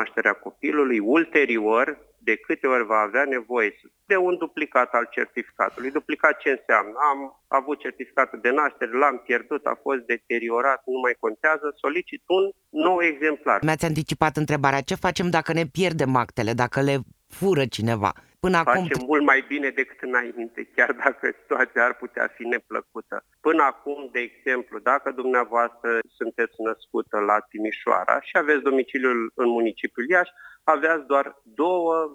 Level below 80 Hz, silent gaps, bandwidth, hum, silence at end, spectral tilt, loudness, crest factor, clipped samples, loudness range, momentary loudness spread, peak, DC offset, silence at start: -58 dBFS; none; 15.5 kHz; none; 0 s; -6 dB/octave; -23 LUFS; 24 dB; under 0.1%; 2 LU; 7 LU; 0 dBFS; under 0.1%; 0 s